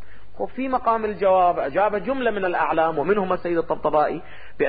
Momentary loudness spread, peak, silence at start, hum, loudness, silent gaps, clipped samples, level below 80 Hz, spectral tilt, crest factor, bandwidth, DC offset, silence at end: 7 LU; -8 dBFS; 0 s; none; -22 LUFS; none; under 0.1%; -50 dBFS; -10.5 dB/octave; 14 dB; 4.9 kHz; 2%; 0 s